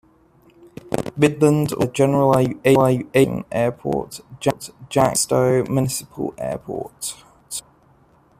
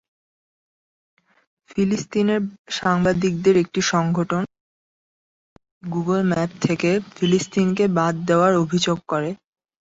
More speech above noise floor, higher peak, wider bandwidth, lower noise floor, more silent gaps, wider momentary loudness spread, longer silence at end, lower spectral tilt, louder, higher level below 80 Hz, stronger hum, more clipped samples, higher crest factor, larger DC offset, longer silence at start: second, 36 dB vs over 70 dB; about the same, -2 dBFS vs -4 dBFS; first, 15.5 kHz vs 8 kHz; second, -55 dBFS vs under -90 dBFS; second, none vs 2.59-2.65 s, 4.60-5.56 s, 5.71-5.81 s; first, 15 LU vs 9 LU; first, 0.8 s vs 0.45 s; about the same, -5.5 dB/octave vs -5.5 dB/octave; about the same, -20 LUFS vs -21 LUFS; about the same, -52 dBFS vs -56 dBFS; neither; neither; about the same, 18 dB vs 18 dB; neither; second, 0.85 s vs 1.75 s